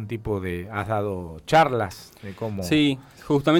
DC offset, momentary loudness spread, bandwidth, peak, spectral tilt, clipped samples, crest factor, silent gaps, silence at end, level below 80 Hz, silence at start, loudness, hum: under 0.1%; 14 LU; 17.5 kHz; -8 dBFS; -6 dB/octave; under 0.1%; 14 dB; none; 0 s; -50 dBFS; 0 s; -24 LUFS; none